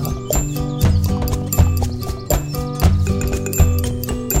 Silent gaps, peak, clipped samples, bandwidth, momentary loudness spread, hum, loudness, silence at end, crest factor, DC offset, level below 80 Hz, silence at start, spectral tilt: none; 0 dBFS; under 0.1%; 16.5 kHz; 6 LU; none; -19 LUFS; 0 s; 16 dB; under 0.1%; -22 dBFS; 0 s; -5.5 dB/octave